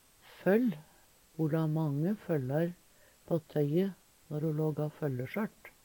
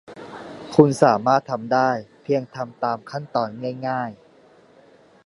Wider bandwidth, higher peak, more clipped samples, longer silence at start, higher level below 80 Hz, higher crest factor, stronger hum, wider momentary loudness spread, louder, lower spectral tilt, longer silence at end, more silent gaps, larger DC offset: first, 19 kHz vs 11.5 kHz; second, -16 dBFS vs 0 dBFS; neither; first, 0.3 s vs 0.1 s; second, -72 dBFS vs -64 dBFS; about the same, 18 dB vs 22 dB; neither; second, 8 LU vs 17 LU; second, -33 LUFS vs -21 LUFS; first, -8.5 dB/octave vs -6.5 dB/octave; second, 0.15 s vs 1.1 s; neither; neither